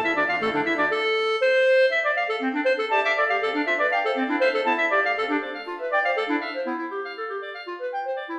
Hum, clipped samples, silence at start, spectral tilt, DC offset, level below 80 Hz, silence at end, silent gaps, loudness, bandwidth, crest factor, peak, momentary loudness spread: none; under 0.1%; 0 s; -4 dB/octave; under 0.1%; -68 dBFS; 0 s; none; -23 LUFS; 8.8 kHz; 14 dB; -10 dBFS; 11 LU